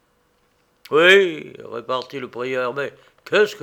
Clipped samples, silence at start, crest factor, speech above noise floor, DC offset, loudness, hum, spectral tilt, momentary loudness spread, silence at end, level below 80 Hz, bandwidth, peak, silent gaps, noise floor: under 0.1%; 0.9 s; 20 dB; 43 dB; under 0.1%; -18 LUFS; none; -4 dB/octave; 20 LU; 0.05 s; -72 dBFS; 17 kHz; 0 dBFS; none; -63 dBFS